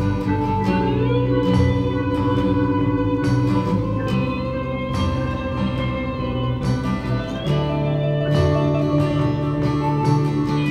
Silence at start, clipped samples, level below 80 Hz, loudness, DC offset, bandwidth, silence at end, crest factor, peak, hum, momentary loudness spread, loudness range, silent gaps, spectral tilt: 0 s; under 0.1%; -34 dBFS; -21 LUFS; 0.1%; 11 kHz; 0 s; 14 dB; -6 dBFS; none; 5 LU; 3 LU; none; -8 dB/octave